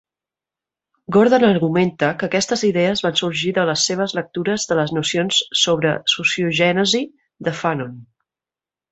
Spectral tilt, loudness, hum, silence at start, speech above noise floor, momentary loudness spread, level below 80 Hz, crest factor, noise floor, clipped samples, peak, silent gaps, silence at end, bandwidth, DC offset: -4 dB/octave; -18 LUFS; none; 1.1 s; over 72 dB; 8 LU; -58 dBFS; 18 dB; under -90 dBFS; under 0.1%; -2 dBFS; none; 0.9 s; 8.4 kHz; under 0.1%